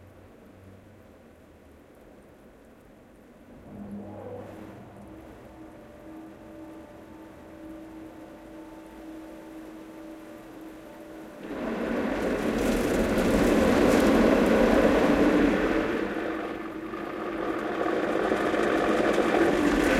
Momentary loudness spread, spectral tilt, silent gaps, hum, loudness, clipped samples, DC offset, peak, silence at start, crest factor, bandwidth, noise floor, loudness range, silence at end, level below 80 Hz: 25 LU; -5.5 dB/octave; none; none; -25 LUFS; under 0.1%; under 0.1%; -8 dBFS; 0.65 s; 18 dB; 16 kHz; -52 dBFS; 23 LU; 0 s; -44 dBFS